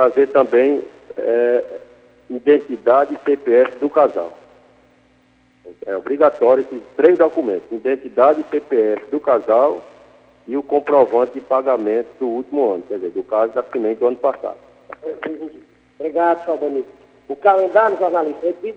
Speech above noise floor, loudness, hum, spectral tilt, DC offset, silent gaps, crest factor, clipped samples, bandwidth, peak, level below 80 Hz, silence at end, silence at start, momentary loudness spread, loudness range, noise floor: 39 dB; -17 LUFS; 60 Hz at -65 dBFS; -7 dB/octave; under 0.1%; none; 18 dB; under 0.1%; 5.6 kHz; 0 dBFS; -66 dBFS; 0 s; 0 s; 14 LU; 5 LU; -55 dBFS